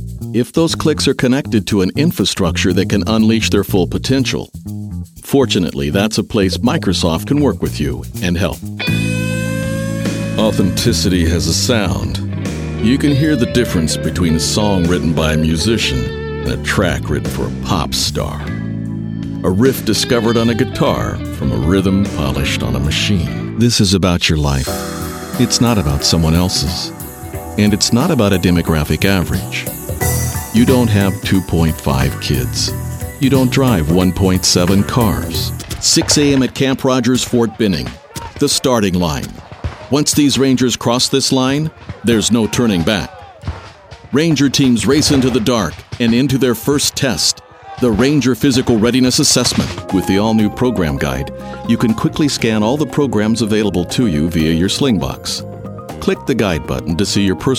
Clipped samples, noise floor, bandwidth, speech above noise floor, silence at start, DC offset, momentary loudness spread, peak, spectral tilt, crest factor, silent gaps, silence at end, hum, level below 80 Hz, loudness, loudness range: under 0.1%; -36 dBFS; 17.5 kHz; 22 dB; 0 s; under 0.1%; 9 LU; 0 dBFS; -4.5 dB/octave; 14 dB; none; 0 s; none; -30 dBFS; -15 LUFS; 3 LU